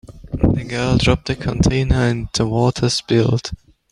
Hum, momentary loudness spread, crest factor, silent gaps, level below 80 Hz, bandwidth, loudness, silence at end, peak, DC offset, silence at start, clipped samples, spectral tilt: none; 7 LU; 16 dB; none; -30 dBFS; 11 kHz; -18 LUFS; 0.35 s; -2 dBFS; under 0.1%; 0.1 s; under 0.1%; -5.5 dB/octave